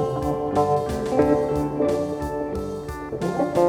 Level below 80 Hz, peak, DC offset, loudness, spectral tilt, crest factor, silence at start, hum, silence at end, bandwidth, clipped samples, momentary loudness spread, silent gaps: -42 dBFS; -6 dBFS; under 0.1%; -24 LUFS; -7.5 dB/octave; 16 dB; 0 s; none; 0 s; 17.5 kHz; under 0.1%; 9 LU; none